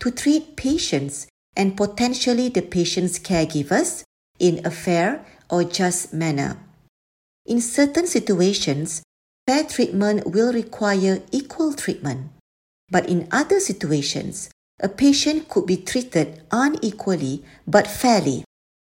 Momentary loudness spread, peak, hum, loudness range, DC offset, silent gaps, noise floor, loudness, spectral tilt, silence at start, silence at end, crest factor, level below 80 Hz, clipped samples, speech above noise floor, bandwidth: 10 LU; 0 dBFS; none; 2 LU; under 0.1%; 1.30-1.53 s, 4.06-4.34 s, 6.89-7.45 s, 9.04-9.46 s, 12.40-12.87 s, 14.53-14.78 s; under -90 dBFS; -21 LUFS; -4.5 dB/octave; 0 s; 0.5 s; 20 dB; -52 dBFS; under 0.1%; over 69 dB; 16.5 kHz